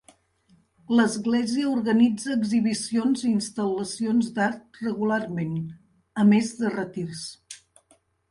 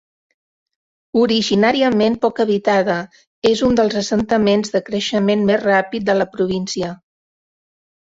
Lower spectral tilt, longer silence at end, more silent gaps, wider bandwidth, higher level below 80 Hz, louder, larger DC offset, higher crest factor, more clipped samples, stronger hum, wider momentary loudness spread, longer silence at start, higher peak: about the same, -5.5 dB/octave vs -5 dB/octave; second, 0.75 s vs 1.2 s; second, none vs 3.27-3.42 s; first, 11.5 kHz vs 7.8 kHz; second, -64 dBFS vs -50 dBFS; second, -24 LUFS vs -17 LUFS; neither; about the same, 16 dB vs 16 dB; neither; neither; first, 14 LU vs 7 LU; second, 0.9 s vs 1.15 s; second, -8 dBFS vs -2 dBFS